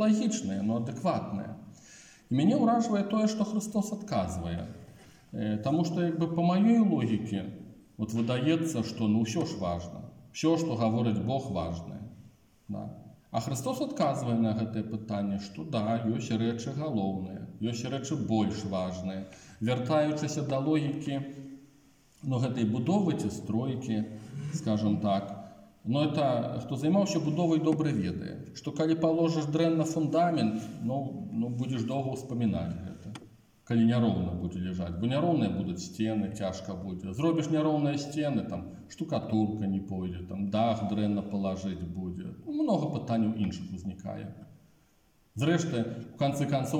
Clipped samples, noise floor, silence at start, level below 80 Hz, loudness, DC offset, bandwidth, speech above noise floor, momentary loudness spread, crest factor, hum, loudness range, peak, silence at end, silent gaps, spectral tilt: under 0.1%; -66 dBFS; 0 s; -64 dBFS; -30 LUFS; under 0.1%; 15.5 kHz; 37 dB; 13 LU; 16 dB; none; 4 LU; -14 dBFS; 0 s; none; -7 dB/octave